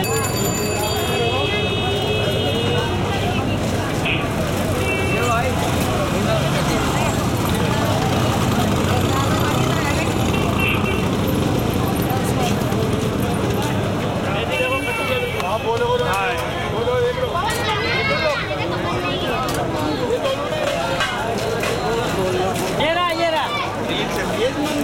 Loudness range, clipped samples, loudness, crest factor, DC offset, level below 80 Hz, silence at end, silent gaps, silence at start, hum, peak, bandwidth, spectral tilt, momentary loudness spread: 2 LU; under 0.1%; -20 LUFS; 14 dB; under 0.1%; -36 dBFS; 0 s; none; 0 s; none; -6 dBFS; 17 kHz; -5 dB/octave; 3 LU